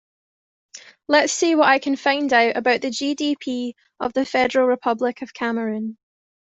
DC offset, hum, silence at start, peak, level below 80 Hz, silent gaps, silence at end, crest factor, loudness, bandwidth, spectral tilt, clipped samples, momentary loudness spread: under 0.1%; none; 0.75 s; -2 dBFS; -64 dBFS; none; 0.55 s; 18 dB; -20 LUFS; 8.2 kHz; -2.5 dB/octave; under 0.1%; 11 LU